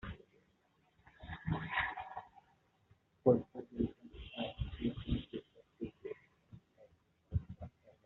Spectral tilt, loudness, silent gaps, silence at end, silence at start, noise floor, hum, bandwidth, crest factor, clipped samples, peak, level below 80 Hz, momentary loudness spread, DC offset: -5.5 dB/octave; -40 LUFS; none; 0.15 s; 0.05 s; -75 dBFS; none; 4.2 kHz; 26 dB; under 0.1%; -16 dBFS; -54 dBFS; 19 LU; under 0.1%